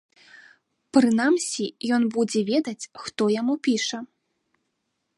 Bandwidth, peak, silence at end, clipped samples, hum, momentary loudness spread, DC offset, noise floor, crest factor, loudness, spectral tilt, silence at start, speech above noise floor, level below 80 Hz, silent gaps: 11.5 kHz; -4 dBFS; 1.1 s; under 0.1%; none; 12 LU; under 0.1%; -77 dBFS; 20 dB; -23 LUFS; -4 dB/octave; 0.95 s; 54 dB; -74 dBFS; none